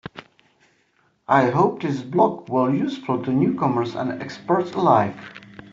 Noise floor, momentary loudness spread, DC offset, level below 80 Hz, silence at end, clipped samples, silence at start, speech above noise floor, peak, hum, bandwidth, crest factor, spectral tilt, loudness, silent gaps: -64 dBFS; 17 LU; under 0.1%; -62 dBFS; 0.05 s; under 0.1%; 0.15 s; 43 dB; -4 dBFS; none; 7.6 kHz; 18 dB; -6.5 dB/octave; -21 LUFS; none